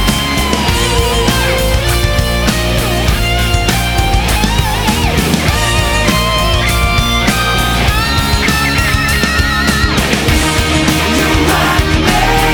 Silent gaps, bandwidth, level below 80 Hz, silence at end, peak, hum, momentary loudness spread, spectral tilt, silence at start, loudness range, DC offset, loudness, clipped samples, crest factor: none; over 20 kHz; -18 dBFS; 0 s; 0 dBFS; none; 2 LU; -4 dB/octave; 0 s; 1 LU; under 0.1%; -12 LUFS; under 0.1%; 12 dB